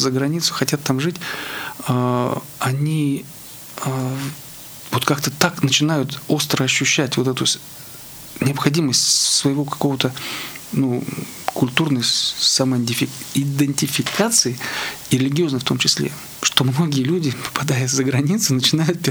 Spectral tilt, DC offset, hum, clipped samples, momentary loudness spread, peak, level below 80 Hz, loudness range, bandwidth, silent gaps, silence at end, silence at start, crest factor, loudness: -3.5 dB/octave; under 0.1%; none; under 0.1%; 11 LU; 0 dBFS; -58 dBFS; 5 LU; over 20 kHz; none; 0 s; 0 s; 20 dB; -19 LUFS